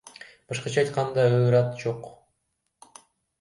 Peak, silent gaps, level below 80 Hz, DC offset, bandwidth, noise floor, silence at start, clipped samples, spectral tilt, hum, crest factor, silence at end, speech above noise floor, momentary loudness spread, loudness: -8 dBFS; none; -64 dBFS; under 0.1%; 11.5 kHz; -77 dBFS; 0.5 s; under 0.1%; -6.5 dB/octave; none; 18 dB; 1.25 s; 54 dB; 24 LU; -24 LUFS